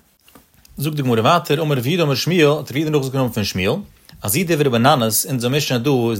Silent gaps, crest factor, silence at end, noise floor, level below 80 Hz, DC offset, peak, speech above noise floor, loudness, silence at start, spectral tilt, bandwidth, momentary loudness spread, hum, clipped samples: none; 18 dB; 0 s; -50 dBFS; -52 dBFS; under 0.1%; 0 dBFS; 33 dB; -18 LUFS; 0.75 s; -5 dB/octave; 16.5 kHz; 7 LU; none; under 0.1%